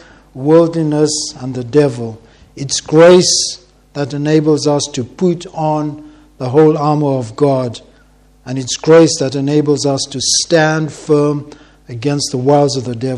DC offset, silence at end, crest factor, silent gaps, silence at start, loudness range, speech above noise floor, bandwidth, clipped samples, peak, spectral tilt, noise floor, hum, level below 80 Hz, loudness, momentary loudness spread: under 0.1%; 0 s; 14 dB; none; 0.35 s; 3 LU; 34 dB; 12 kHz; 0.2%; 0 dBFS; -4.5 dB/octave; -47 dBFS; none; -50 dBFS; -13 LUFS; 15 LU